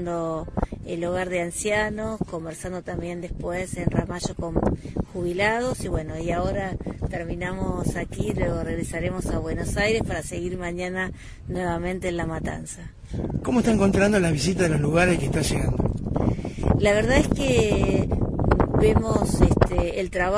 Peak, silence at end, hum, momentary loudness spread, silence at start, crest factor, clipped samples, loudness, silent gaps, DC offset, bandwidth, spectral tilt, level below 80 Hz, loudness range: -4 dBFS; 0 s; none; 11 LU; 0 s; 20 dB; under 0.1%; -24 LUFS; none; under 0.1%; 11 kHz; -6 dB/octave; -34 dBFS; 7 LU